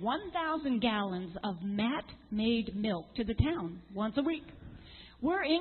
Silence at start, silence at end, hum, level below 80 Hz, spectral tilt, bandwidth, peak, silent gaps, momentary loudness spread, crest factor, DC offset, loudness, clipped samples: 0 s; 0 s; none; -50 dBFS; -4.5 dB/octave; 4.4 kHz; -14 dBFS; none; 10 LU; 20 dB; under 0.1%; -34 LUFS; under 0.1%